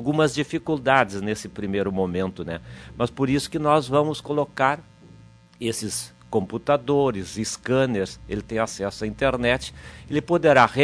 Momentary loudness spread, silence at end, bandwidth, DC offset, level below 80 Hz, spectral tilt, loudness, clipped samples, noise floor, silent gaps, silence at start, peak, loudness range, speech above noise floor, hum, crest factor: 10 LU; 0 s; 11 kHz; under 0.1%; -48 dBFS; -5 dB/octave; -24 LUFS; under 0.1%; -49 dBFS; none; 0 s; -2 dBFS; 2 LU; 26 dB; none; 22 dB